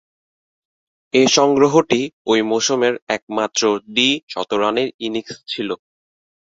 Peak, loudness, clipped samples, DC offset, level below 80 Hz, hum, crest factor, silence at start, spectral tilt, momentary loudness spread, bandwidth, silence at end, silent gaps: 0 dBFS; -18 LUFS; under 0.1%; under 0.1%; -62 dBFS; none; 18 dB; 1.15 s; -3 dB/octave; 12 LU; 7.8 kHz; 0.8 s; 2.13-2.25 s, 3.02-3.07 s, 3.22-3.27 s, 4.23-4.27 s, 4.94-4.99 s